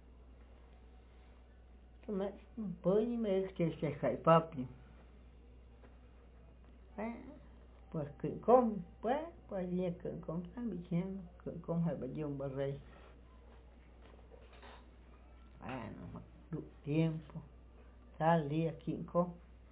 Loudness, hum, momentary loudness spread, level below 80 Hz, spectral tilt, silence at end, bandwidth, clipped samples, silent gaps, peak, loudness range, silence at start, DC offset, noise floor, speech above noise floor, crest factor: -37 LUFS; none; 25 LU; -58 dBFS; -7.5 dB/octave; 0.05 s; 4 kHz; under 0.1%; none; -14 dBFS; 15 LU; 0.05 s; under 0.1%; -59 dBFS; 22 dB; 24 dB